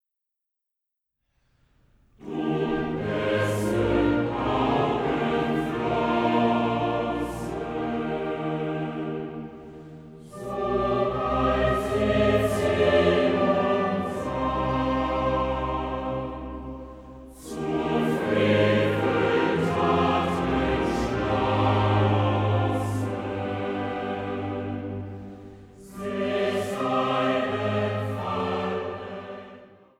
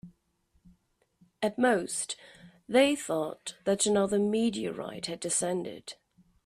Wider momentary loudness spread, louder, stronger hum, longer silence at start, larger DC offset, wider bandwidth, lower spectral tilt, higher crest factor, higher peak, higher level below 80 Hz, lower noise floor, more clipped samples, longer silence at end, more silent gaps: first, 15 LU vs 12 LU; first, -25 LUFS vs -29 LUFS; neither; first, 2.2 s vs 0.05 s; neither; about the same, 15 kHz vs 15 kHz; first, -7 dB/octave vs -3.5 dB/octave; about the same, 16 dB vs 20 dB; first, -8 dBFS vs -12 dBFS; first, -44 dBFS vs -68 dBFS; first, -85 dBFS vs -72 dBFS; neither; second, 0.35 s vs 0.5 s; neither